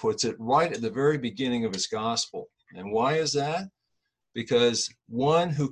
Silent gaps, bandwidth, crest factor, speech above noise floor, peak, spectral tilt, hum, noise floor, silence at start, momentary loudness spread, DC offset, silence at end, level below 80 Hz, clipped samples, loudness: none; 11 kHz; 16 dB; 54 dB; -10 dBFS; -4 dB/octave; none; -80 dBFS; 0 s; 13 LU; under 0.1%; 0 s; -64 dBFS; under 0.1%; -26 LUFS